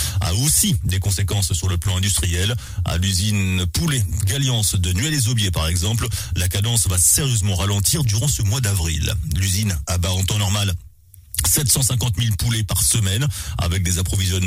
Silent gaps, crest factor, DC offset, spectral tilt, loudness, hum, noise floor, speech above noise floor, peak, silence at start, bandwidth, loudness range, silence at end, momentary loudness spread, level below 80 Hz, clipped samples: none; 16 dB; under 0.1%; -3.5 dB/octave; -19 LUFS; none; -40 dBFS; 21 dB; -4 dBFS; 0 s; 16 kHz; 2 LU; 0 s; 7 LU; -32 dBFS; under 0.1%